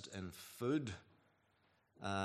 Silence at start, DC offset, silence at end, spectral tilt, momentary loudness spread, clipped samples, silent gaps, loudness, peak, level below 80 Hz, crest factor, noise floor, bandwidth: 0 s; under 0.1%; 0 s; -5.5 dB/octave; 11 LU; under 0.1%; none; -43 LUFS; -24 dBFS; -78 dBFS; 20 dB; -77 dBFS; 14.5 kHz